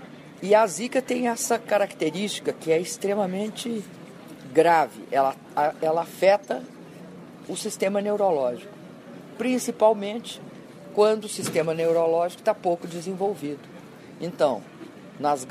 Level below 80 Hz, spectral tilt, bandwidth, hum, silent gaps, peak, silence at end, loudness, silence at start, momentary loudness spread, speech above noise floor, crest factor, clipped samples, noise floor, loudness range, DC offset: -74 dBFS; -4.5 dB/octave; 15.5 kHz; none; none; -6 dBFS; 0 s; -25 LUFS; 0 s; 22 LU; 20 dB; 18 dB; under 0.1%; -44 dBFS; 3 LU; under 0.1%